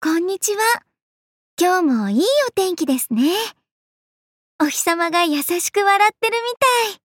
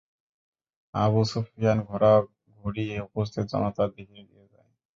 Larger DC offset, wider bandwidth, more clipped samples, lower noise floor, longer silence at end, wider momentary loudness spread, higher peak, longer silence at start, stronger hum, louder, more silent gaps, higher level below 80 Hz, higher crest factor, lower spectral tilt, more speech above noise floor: neither; first, 17 kHz vs 7.6 kHz; neither; first, under -90 dBFS vs -61 dBFS; second, 0.1 s vs 0.75 s; second, 5 LU vs 14 LU; about the same, -6 dBFS vs -8 dBFS; second, 0 s vs 0.95 s; neither; first, -18 LUFS vs -26 LUFS; first, 1.02-1.57 s, 3.71-4.59 s vs none; second, -74 dBFS vs -54 dBFS; second, 14 dB vs 20 dB; second, -2.5 dB/octave vs -7.5 dB/octave; first, over 72 dB vs 36 dB